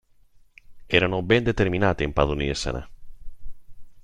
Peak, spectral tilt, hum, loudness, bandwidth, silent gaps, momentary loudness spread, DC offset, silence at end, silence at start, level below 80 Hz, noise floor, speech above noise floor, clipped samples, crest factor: -2 dBFS; -5.5 dB/octave; none; -23 LUFS; 10.5 kHz; none; 8 LU; under 0.1%; 0.05 s; 0.7 s; -38 dBFS; -54 dBFS; 32 dB; under 0.1%; 22 dB